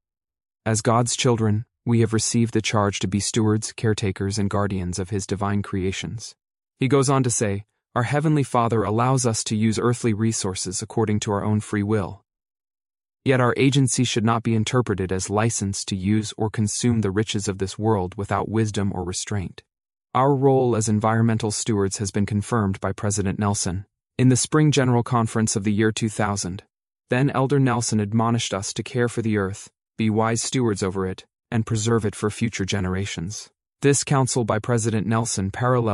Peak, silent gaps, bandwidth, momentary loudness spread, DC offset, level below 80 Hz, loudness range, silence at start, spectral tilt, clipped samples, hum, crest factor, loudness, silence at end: -4 dBFS; none; 11.5 kHz; 8 LU; under 0.1%; -56 dBFS; 3 LU; 0.65 s; -5 dB/octave; under 0.1%; none; 18 dB; -22 LUFS; 0 s